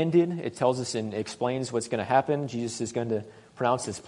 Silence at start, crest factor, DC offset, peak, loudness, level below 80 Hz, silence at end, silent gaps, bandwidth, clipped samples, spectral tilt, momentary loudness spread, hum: 0 s; 20 dB; under 0.1%; -8 dBFS; -28 LUFS; -68 dBFS; 0 s; none; 11 kHz; under 0.1%; -5.5 dB/octave; 7 LU; none